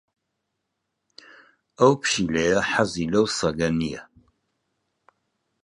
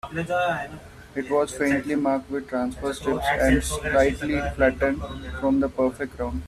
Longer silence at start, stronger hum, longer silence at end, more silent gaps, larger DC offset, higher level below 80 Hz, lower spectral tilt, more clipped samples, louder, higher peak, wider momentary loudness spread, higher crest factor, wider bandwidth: first, 1.8 s vs 0.05 s; neither; first, 1.6 s vs 0 s; neither; neither; second, -52 dBFS vs -38 dBFS; about the same, -4.5 dB/octave vs -5.5 dB/octave; neither; about the same, -22 LUFS vs -24 LUFS; about the same, -4 dBFS vs -6 dBFS; second, 7 LU vs 10 LU; about the same, 22 dB vs 18 dB; second, 11.5 kHz vs 14 kHz